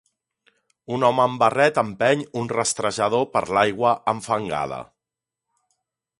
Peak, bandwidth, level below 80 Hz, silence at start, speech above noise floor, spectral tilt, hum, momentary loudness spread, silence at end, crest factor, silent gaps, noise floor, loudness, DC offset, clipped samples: -2 dBFS; 11.5 kHz; -60 dBFS; 0.9 s; 66 dB; -4 dB/octave; none; 8 LU; 1.35 s; 20 dB; none; -87 dBFS; -21 LUFS; under 0.1%; under 0.1%